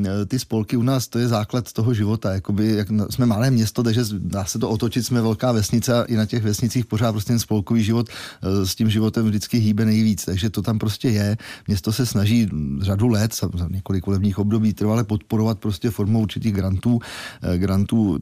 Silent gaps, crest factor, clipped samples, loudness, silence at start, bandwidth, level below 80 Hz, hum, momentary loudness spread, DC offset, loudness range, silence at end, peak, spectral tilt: none; 12 dB; under 0.1%; -21 LUFS; 0 s; 15.5 kHz; -48 dBFS; none; 5 LU; under 0.1%; 1 LU; 0 s; -8 dBFS; -6 dB/octave